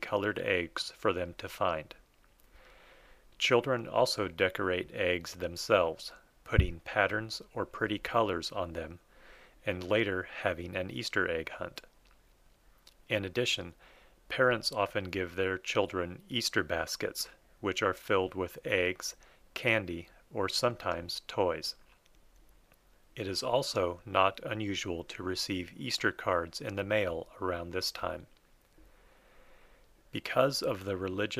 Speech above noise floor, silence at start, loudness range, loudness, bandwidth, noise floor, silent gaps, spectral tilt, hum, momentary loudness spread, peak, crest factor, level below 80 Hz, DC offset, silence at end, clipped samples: 31 dB; 0 s; 5 LU; -32 LUFS; 15.5 kHz; -64 dBFS; none; -4 dB/octave; none; 11 LU; -10 dBFS; 24 dB; -50 dBFS; under 0.1%; 0 s; under 0.1%